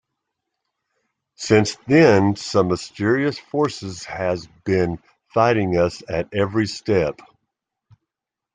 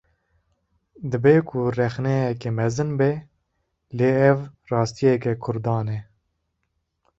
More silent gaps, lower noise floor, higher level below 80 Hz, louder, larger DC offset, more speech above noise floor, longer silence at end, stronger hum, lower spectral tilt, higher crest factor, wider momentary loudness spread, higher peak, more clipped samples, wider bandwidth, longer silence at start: neither; first, -85 dBFS vs -75 dBFS; about the same, -54 dBFS vs -56 dBFS; about the same, -20 LUFS vs -22 LUFS; neither; first, 66 dB vs 54 dB; first, 1.4 s vs 1.15 s; neither; second, -6 dB/octave vs -7.5 dB/octave; about the same, 20 dB vs 20 dB; about the same, 12 LU vs 12 LU; about the same, -2 dBFS vs -2 dBFS; neither; first, 9.6 kHz vs 8 kHz; first, 1.4 s vs 1 s